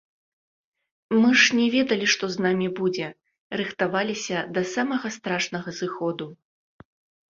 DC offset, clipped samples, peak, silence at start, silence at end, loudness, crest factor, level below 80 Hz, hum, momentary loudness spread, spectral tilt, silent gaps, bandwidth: under 0.1%; under 0.1%; -6 dBFS; 1.1 s; 0.95 s; -23 LUFS; 20 dB; -68 dBFS; none; 13 LU; -4 dB/octave; 3.38-3.50 s; 7.6 kHz